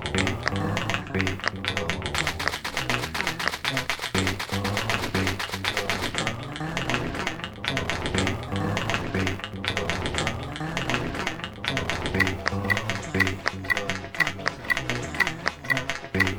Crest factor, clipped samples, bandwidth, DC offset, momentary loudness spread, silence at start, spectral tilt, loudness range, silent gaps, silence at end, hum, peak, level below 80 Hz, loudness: 26 dB; under 0.1%; 19.5 kHz; 0.2%; 5 LU; 0 s; -4 dB/octave; 2 LU; none; 0 s; none; -2 dBFS; -44 dBFS; -27 LUFS